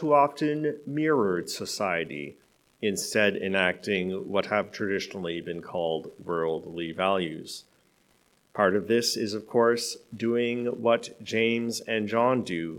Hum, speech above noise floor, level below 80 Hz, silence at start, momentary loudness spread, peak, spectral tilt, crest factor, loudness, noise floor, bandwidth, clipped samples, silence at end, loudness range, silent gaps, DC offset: none; 38 dB; -72 dBFS; 0 s; 9 LU; -6 dBFS; -4.5 dB/octave; 20 dB; -27 LUFS; -65 dBFS; 18 kHz; under 0.1%; 0 s; 4 LU; none; under 0.1%